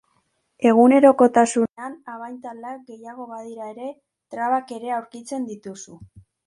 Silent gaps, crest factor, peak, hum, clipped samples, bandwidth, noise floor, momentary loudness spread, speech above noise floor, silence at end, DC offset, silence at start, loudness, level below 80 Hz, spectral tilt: 1.72-1.76 s; 20 dB; -2 dBFS; none; under 0.1%; 11.5 kHz; -69 dBFS; 23 LU; 48 dB; 0.4 s; under 0.1%; 0.6 s; -18 LUFS; -66 dBFS; -5 dB/octave